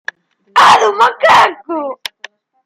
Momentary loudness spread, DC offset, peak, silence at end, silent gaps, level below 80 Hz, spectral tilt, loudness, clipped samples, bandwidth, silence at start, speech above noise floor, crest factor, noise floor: 18 LU; under 0.1%; 0 dBFS; 0.7 s; none; -60 dBFS; -2 dB/octave; -10 LUFS; under 0.1%; 16 kHz; 0.55 s; 27 dB; 12 dB; -38 dBFS